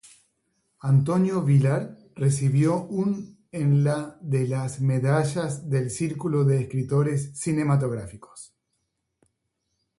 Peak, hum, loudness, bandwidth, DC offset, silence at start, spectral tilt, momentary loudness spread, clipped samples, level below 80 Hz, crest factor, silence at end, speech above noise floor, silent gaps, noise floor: -10 dBFS; none; -24 LUFS; 11.5 kHz; under 0.1%; 0.85 s; -7.5 dB/octave; 12 LU; under 0.1%; -60 dBFS; 16 dB; 1.55 s; 54 dB; none; -77 dBFS